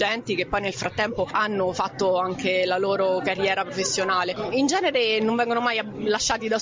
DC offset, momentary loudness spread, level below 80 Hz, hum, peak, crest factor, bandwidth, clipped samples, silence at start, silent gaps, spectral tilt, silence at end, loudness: under 0.1%; 4 LU; -54 dBFS; none; -10 dBFS; 14 dB; 7.8 kHz; under 0.1%; 0 s; none; -3 dB/octave; 0 s; -23 LUFS